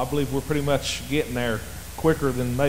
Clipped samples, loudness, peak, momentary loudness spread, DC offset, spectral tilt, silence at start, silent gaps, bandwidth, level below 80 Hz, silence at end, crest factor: under 0.1%; -25 LUFS; -8 dBFS; 5 LU; 1%; -5 dB/octave; 0 s; none; 16 kHz; -40 dBFS; 0 s; 16 dB